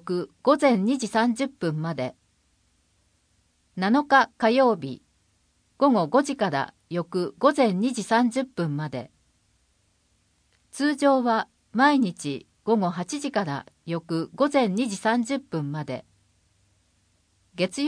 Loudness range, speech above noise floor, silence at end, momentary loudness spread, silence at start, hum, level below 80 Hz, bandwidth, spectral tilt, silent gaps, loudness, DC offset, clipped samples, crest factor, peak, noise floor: 4 LU; 44 dB; 0 s; 13 LU; 0.05 s; none; -70 dBFS; 10.5 kHz; -5.5 dB/octave; none; -24 LUFS; under 0.1%; under 0.1%; 20 dB; -4 dBFS; -67 dBFS